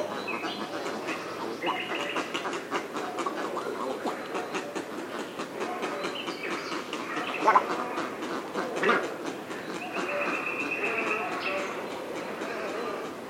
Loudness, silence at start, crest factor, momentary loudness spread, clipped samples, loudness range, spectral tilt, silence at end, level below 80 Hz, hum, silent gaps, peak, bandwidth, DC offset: -31 LUFS; 0 s; 24 dB; 9 LU; under 0.1%; 5 LU; -3.5 dB/octave; 0 s; -76 dBFS; none; none; -8 dBFS; 17 kHz; under 0.1%